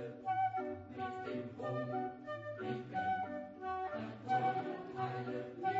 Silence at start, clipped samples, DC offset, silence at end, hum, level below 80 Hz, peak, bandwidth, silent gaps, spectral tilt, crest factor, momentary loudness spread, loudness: 0 s; under 0.1%; under 0.1%; 0 s; none; -76 dBFS; -24 dBFS; 7.6 kHz; none; -5 dB/octave; 16 dB; 8 LU; -40 LUFS